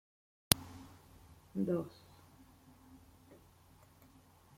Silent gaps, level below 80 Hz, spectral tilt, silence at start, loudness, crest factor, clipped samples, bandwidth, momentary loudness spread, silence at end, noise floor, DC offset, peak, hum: none; -62 dBFS; -3 dB/octave; 0.5 s; -35 LUFS; 42 dB; under 0.1%; 16.5 kHz; 27 LU; 1.6 s; -64 dBFS; under 0.1%; 0 dBFS; none